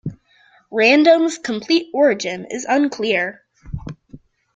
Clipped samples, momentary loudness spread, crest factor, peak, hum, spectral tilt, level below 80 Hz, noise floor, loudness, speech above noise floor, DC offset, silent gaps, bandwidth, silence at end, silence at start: under 0.1%; 20 LU; 16 dB; -2 dBFS; none; -4.5 dB/octave; -48 dBFS; -54 dBFS; -17 LUFS; 38 dB; under 0.1%; none; 9.2 kHz; 0.4 s; 0.05 s